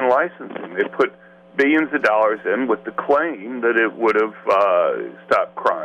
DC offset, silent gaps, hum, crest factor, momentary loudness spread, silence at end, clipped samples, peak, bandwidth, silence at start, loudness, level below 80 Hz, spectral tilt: under 0.1%; none; none; 14 dB; 8 LU; 0 s; under 0.1%; -4 dBFS; 9.6 kHz; 0 s; -19 LUFS; -66 dBFS; -6 dB/octave